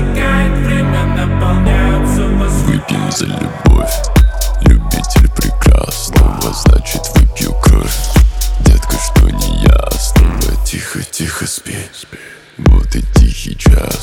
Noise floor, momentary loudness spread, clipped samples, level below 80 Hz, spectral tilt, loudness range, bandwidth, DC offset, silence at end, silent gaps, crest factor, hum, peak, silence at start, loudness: -34 dBFS; 7 LU; under 0.1%; -12 dBFS; -5.5 dB/octave; 3 LU; 17.5 kHz; under 0.1%; 0 s; none; 10 dB; none; 0 dBFS; 0 s; -13 LUFS